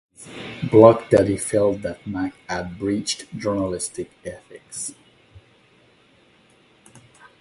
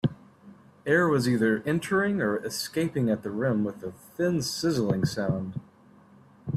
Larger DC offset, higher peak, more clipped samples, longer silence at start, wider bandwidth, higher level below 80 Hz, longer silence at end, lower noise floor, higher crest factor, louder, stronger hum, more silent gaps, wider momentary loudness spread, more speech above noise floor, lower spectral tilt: neither; first, 0 dBFS vs -10 dBFS; neither; first, 0.2 s vs 0.05 s; second, 11.5 kHz vs 15.5 kHz; first, -52 dBFS vs -62 dBFS; first, 2.5 s vs 0 s; about the same, -56 dBFS vs -55 dBFS; about the same, 22 dB vs 18 dB; first, -20 LUFS vs -27 LUFS; neither; neither; first, 23 LU vs 13 LU; first, 36 dB vs 29 dB; about the same, -5.5 dB/octave vs -5.5 dB/octave